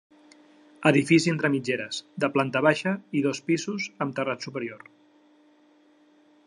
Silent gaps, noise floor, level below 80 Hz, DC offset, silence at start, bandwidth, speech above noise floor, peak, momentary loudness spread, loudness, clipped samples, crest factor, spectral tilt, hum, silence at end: none; -60 dBFS; -74 dBFS; under 0.1%; 0.8 s; 11 kHz; 34 dB; -4 dBFS; 12 LU; -25 LUFS; under 0.1%; 22 dB; -5.5 dB/octave; none; 1.7 s